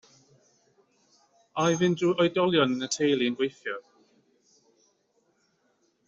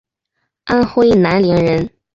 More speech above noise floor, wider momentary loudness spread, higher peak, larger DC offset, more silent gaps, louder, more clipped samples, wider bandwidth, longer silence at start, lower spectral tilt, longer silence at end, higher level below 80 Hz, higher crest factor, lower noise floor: second, 45 dB vs 60 dB; first, 13 LU vs 8 LU; second, -10 dBFS vs -2 dBFS; neither; neither; second, -26 LUFS vs -13 LUFS; neither; about the same, 8 kHz vs 7.6 kHz; first, 1.55 s vs 0.65 s; second, -4 dB/octave vs -8 dB/octave; first, 2.25 s vs 0.25 s; second, -70 dBFS vs -40 dBFS; first, 20 dB vs 12 dB; about the same, -71 dBFS vs -72 dBFS